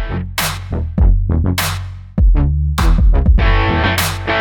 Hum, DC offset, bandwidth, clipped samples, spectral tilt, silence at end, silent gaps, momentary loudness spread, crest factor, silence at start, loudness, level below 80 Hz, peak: none; under 0.1%; over 20 kHz; under 0.1%; -5 dB/octave; 0 s; none; 8 LU; 12 dB; 0 s; -16 LUFS; -14 dBFS; -2 dBFS